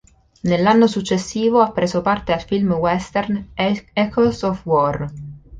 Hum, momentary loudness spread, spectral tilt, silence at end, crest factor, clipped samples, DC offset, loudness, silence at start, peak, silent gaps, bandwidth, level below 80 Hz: none; 8 LU; -6 dB/octave; 0 s; 16 dB; under 0.1%; under 0.1%; -19 LUFS; 0.45 s; -2 dBFS; none; 9.4 kHz; -44 dBFS